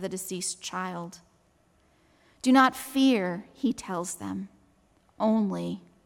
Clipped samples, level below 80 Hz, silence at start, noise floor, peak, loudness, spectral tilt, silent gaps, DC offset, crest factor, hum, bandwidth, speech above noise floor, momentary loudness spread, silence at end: under 0.1%; -68 dBFS; 0 s; -65 dBFS; -8 dBFS; -27 LUFS; -4.5 dB/octave; none; under 0.1%; 20 dB; none; 17 kHz; 38 dB; 15 LU; 0.25 s